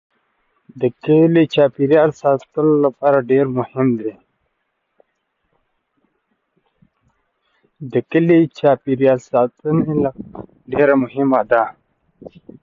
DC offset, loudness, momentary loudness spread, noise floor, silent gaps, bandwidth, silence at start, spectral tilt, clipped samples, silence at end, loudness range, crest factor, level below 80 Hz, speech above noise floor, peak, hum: under 0.1%; -16 LUFS; 10 LU; -71 dBFS; none; 7.4 kHz; 0.75 s; -8.5 dB/octave; under 0.1%; 0.35 s; 10 LU; 16 dB; -58 dBFS; 55 dB; -2 dBFS; none